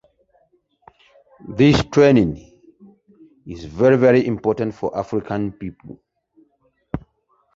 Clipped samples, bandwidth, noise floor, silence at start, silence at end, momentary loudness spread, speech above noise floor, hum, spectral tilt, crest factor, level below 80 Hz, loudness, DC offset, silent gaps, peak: under 0.1%; 7.8 kHz; -64 dBFS; 1.45 s; 0.55 s; 20 LU; 47 dB; none; -7 dB/octave; 18 dB; -44 dBFS; -17 LUFS; under 0.1%; none; -2 dBFS